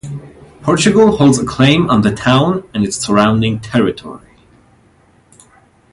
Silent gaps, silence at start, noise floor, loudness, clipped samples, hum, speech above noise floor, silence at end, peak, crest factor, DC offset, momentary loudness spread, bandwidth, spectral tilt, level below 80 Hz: none; 0.05 s; -50 dBFS; -12 LUFS; under 0.1%; none; 38 dB; 1.75 s; 0 dBFS; 14 dB; under 0.1%; 13 LU; 11.5 kHz; -5.5 dB/octave; -42 dBFS